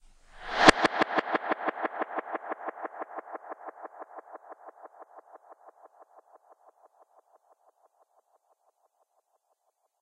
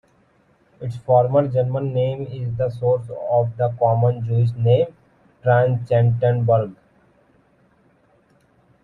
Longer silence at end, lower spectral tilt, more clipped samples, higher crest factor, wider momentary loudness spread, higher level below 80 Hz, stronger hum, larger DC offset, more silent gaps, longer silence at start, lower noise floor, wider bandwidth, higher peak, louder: first, 4.15 s vs 2.1 s; second, -3 dB/octave vs -10 dB/octave; neither; first, 30 dB vs 16 dB; first, 29 LU vs 9 LU; about the same, -54 dBFS vs -56 dBFS; neither; neither; neither; second, 0.35 s vs 0.8 s; first, -76 dBFS vs -59 dBFS; first, 10.5 kHz vs 4.3 kHz; about the same, -4 dBFS vs -4 dBFS; second, -27 LUFS vs -20 LUFS